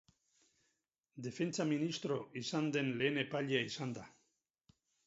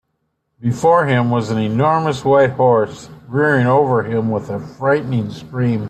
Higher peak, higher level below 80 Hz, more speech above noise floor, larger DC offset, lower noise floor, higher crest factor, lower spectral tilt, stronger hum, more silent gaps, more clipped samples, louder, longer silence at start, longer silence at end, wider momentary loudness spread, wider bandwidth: second, -20 dBFS vs -2 dBFS; second, -80 dBFS vs -54 dBFS; second, 47 dB vs 54 dB; neither; first, -84 dBFS vs -70 dBFS; first, 20 dB vs 14 dB; second, -4.5 dB/octave vs -7.5 dB/octave; neither; neither; neither; second, -38 LUFS vs -16 LUFS; first, 1.15 s vs 0.6 s; first, 0.95 s vs 0 s; about the same, 9 LU vs 10 LU; second, 7.6 kHz vs 9 kHz